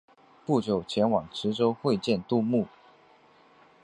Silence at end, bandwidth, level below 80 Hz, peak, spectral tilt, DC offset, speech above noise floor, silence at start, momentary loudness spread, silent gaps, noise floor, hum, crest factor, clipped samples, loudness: 1.15 s; 10.5 kHz; -62 dBFS; -10 dBFS; -7 dB/octave; under 0.1%; 32 dB; 0.5 s; 5 LU; none; -58 dBFS; none; 18 dB; under 0.1%; -27 LUFS